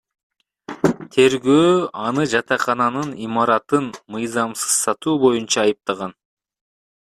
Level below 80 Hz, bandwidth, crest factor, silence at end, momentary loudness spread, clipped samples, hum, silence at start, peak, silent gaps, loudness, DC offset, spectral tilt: -60 dBFS; 14.5 kHz; 18 dB; 0.95 s; 11 LU; under 0.1%; none; 0.7 s; -2 dBFS; none; -19 LUFS; under 0.1%; -4 dB/octave